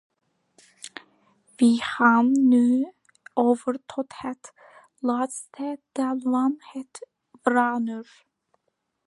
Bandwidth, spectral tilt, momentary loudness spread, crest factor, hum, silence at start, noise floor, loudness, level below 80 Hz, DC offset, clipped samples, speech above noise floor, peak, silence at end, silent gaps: 11.5 kHz; -4.5 dB/octave; 22 LU; 20 dB; none; 0.85 s; -77 dBFS; -23 LUFS; -74 dBFS; under 0.1%; under 0.1%; 54 dB; -6 dBFS; 1.05 s; none